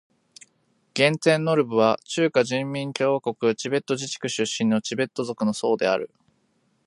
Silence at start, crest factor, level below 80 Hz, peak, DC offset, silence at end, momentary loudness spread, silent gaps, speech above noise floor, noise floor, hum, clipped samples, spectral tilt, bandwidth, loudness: 0.95 s; 20 dB; -70 dBFS; -4 dBFS; under 0.1%; 0.8 s; 8 LU; none; 45 dB; -68 dBFS; none; under 0.1%; -4.5 dB/octave; 11.5 kHz; -23 LUFS